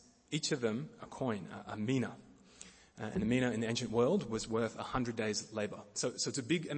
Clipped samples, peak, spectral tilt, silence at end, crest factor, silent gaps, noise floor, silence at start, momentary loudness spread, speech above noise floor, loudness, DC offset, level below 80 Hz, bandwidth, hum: under 0.1%; -18 dBFS; -4.5 dB/octave; 0 s; 18 dB; none; -58 dBFS; 0.3 s; 14 LU; 22 dB; -36 LUFS; under 0.1%; -62 dBFS; 8.8 kHz; none